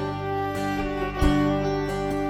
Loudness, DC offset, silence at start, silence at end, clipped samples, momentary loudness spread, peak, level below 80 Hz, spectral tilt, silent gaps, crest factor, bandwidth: -25 LUFS; under 0.1%; 0 s; 0 s; under 0.1%; 6 LU; -8 dBFS; -34 dBFS; -6.5 dB/octave; none; 16 dB; 15.5 kHz